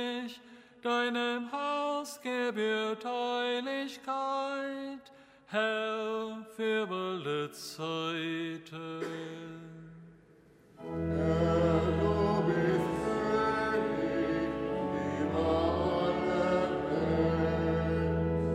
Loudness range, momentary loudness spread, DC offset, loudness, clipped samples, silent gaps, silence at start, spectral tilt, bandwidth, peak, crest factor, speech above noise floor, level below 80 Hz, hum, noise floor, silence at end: 7 LU; 12 LU; under 0.1%; -32 LUFS; under 0.1%; none; 0 s; -6.5 dB/octave; 15.5 kHz; -16 dBFS; 16 dB; 27 dB; -50 dBFS; none; -60 dBFS; 0 s